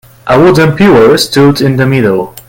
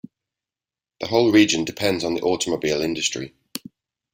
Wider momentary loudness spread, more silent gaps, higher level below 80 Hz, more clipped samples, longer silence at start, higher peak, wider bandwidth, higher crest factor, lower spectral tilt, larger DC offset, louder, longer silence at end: second, 5 LU vs 18 LU; neither; first, -36 dBFS vs -58 dBFS; first, 3% vs under 0.1%; second, 0.25 s vs 1 s; about the same, 0 dBFS vs -2 dBFS; about the same, 17.5 kHz vs 16.5 kHz; second, 6 dB vs 20 dB; first, -6 dB/octave vs -3.5 dB/octave; neither; first, -7 LUFS vs -20 LUFS; second, 0.1 s vs 0.55 s